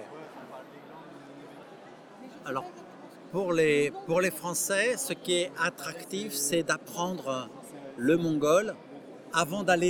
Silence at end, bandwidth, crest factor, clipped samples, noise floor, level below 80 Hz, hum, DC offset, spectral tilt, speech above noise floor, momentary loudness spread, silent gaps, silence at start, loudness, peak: 0 s; over 20 kHz; 20 dB; under 0.1%; -49 dBFS; -72 dBFS; none; under 0.1%; -3.5 dB/octave; 21 dB; 22 LU; none; 0 s; -29 LUFS; -10 dBFS